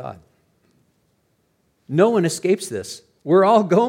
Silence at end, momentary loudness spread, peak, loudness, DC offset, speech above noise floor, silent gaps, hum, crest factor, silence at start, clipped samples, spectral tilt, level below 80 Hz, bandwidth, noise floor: 0 s; 20 LU; -2 dBFS; -18 LUFS; under 0.1%; 48 dB; none; none; 18 dB; 0 s; under 0.1%; -6 dB/octave; -68 dBFS; 16 kHz; -66 dBFS